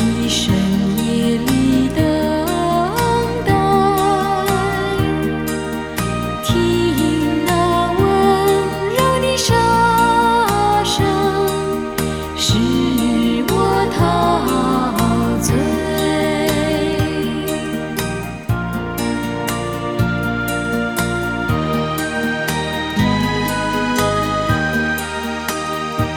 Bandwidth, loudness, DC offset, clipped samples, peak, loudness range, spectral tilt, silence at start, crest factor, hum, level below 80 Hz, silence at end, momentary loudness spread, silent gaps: 18 kHz; -17 LUFS; under 0.1%; under 0.1%; 0 dBFS; 5 LU; -5 dB/octave; 0 s; 16 dB; none; -32 dBFS; 0 s; 7 LU; none